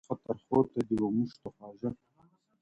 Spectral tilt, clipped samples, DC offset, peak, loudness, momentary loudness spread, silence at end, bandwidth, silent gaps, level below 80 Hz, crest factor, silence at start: -9.5 dB/octave; under 0.1%; under 0.1%; -14 dBFS; -32 LUFS; 18 LU; 0.7 s; 10 kHz; none; -64 dBFS; 20 dB; 0.1 s